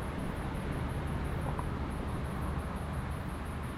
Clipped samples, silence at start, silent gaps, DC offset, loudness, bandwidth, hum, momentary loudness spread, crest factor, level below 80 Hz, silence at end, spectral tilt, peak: under 0.1%; 0 s; none; under 0.1%; -37 LUFS; 14.5 kHz; none; 2 LU; 14 dB; -42 dBFS; 0 s; -7 dB/octave; -22 dBFS